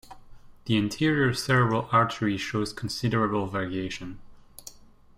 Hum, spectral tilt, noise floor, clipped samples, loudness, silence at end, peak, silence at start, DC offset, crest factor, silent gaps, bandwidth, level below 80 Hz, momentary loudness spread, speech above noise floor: none; -5.5 dB/octave; -49 dBFS; under 0.1%; -26 LUFS; 0.35 s; -8 dBFS; 0.1 s; under 0.1%; 20 dB; none; 16 kHz; -54 dBFS; 20 LU; 23 dB